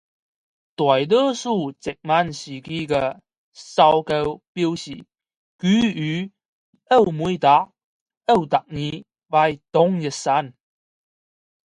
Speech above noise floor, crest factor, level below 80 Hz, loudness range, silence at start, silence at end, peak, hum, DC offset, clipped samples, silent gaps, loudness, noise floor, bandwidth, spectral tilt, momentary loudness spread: over 70 dB; 20 dB; -56 dBFS; 2 LU; 0.8 s; 1.2 s; -2 dBFS; none; under 0.1%; under 0.1%; 3.38-3.52 s, 4.48-4.55 s, 5.36-5.59 s, 6.45-6.73 s, 7.84-8.06 s, 8.17-8.21 s; -20 LUFS; under -90 dBFS; 11 kHz; -5.5 dB/octave; 14 LU